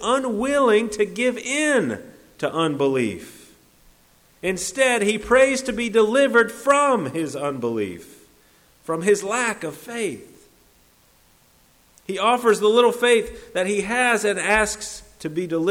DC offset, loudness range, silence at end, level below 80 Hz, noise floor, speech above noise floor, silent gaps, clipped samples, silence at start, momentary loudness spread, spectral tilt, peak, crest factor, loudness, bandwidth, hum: under 0.1%; 8 LU; 0 s; -52 dBFS; -57 dBFS; 36 dB; none; under 0.1%; 0 s; 13 LU; -3.5 dB/octave; -4 dBFS; 16 dB; -21 LUFS; 16.5 kHz; none